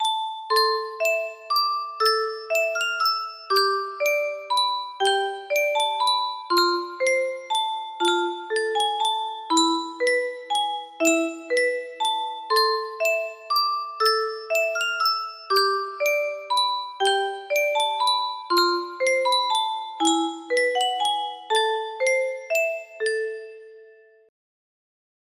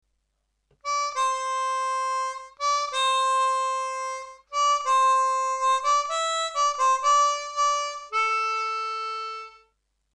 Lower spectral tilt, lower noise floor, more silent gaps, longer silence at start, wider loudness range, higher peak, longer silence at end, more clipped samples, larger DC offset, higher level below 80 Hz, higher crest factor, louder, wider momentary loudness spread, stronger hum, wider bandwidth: first, 0.5 dB/octave vs 4 dB/octave; second, -51 dBFS vs -75 dBFS; neither; second, 0 s vs 0.85 s; about the same, 1 LU vs 3 LU; first, -8 dBFS vs -12 dBFS; first, 1.35 s vs 0.65 s; neither; neither; second, -76 dBFS vs -70 dBFS; about the same, 16 dB vs 14 dB; about the same, -23 LUFS vs -24 LUFS; second, 5 LU vs 11 LU; neither; first, 15.5 kHz vs 10.5 kHz